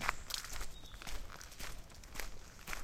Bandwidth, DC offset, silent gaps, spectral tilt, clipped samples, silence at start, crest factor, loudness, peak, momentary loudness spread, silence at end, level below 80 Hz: 17 kHz; under 0.1%; none; -1.5 dB/octave; under 0.1%; 0 s; 32 dB; -46 LUFS; -12 dBFS; 10 LU; 0 s; -48 dBFS